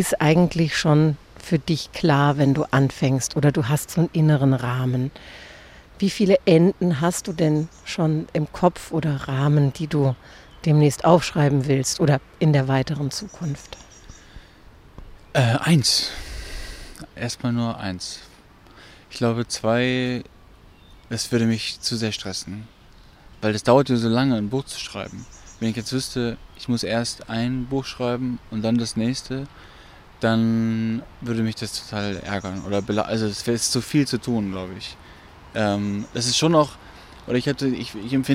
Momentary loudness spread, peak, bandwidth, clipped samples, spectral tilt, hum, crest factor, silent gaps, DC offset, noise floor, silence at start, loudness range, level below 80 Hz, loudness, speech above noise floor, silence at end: 15 LU; -2 dBFS; 15.5 kHz; under 0.1%; -5.5 dB/octave; none; 20 dB; none; under 0.1%; -49 dBFS; 0 s; 6 LU; -48 dBFS; -22 LUFS; 27 dB; 0 s